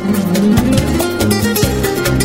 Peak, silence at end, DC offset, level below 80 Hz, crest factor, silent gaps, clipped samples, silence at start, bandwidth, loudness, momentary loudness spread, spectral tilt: 0 dBFS; 0 s; under 0.1%; -26 dBFS; 14 dB; none; under 0.1%; 0 s; 16.5 kHz; -14 LUFS; 3 LU; -5 dB/octave